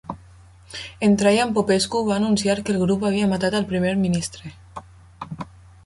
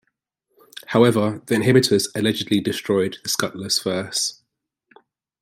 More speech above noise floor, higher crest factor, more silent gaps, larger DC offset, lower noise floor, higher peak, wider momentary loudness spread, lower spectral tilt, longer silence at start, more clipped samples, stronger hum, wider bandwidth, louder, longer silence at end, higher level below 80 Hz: second, 27 dB vs 57 dB; about the same, 18 dB vs 20 dB; neither; neither; second, -48 dBFS vs -77 dBFS; about the same, -4 dBFS vs -2 dBFS; first, 21 LU vs 7 LU; about the same, -5.5 dB/octave vs -4.5 dB/octave; second, 0.1 s vs 0.9 s; neither; neither; second, 11.5 kHz vs 16 kHz; about the same, -20 LUFS vs -20 LUFS; second, 0.4 s vs 1.1 s; first, -50 dBFS vs -62 dBFS